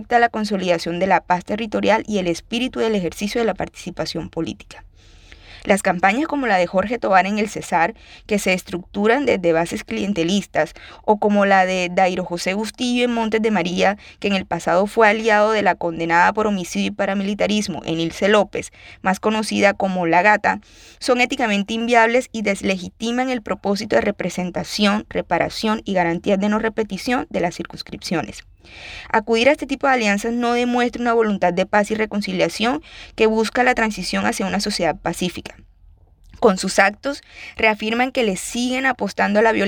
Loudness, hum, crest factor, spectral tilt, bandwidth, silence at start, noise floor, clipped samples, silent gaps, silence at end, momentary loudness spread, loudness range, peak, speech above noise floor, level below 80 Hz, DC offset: -19 LUFS; none; 18 dB; -4.5 dB/octave; 18.5 kHz; 0 s; -50 dBFS; under 0.1%; none; 0 s; 9 LU; 4 LU; -2 dBFS; 30 dB; -48 dBFS; under 0.1%